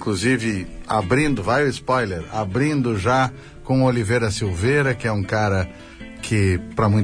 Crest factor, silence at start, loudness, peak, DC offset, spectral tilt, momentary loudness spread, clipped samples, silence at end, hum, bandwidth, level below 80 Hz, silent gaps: 14 dB; 0 s; -21 LUFS; -6 dBFS; under 0.1%; -6 dB/octave; 7 LU; under 0.1%; 0 s; none; 10.5 kHz; -42 dBFS; none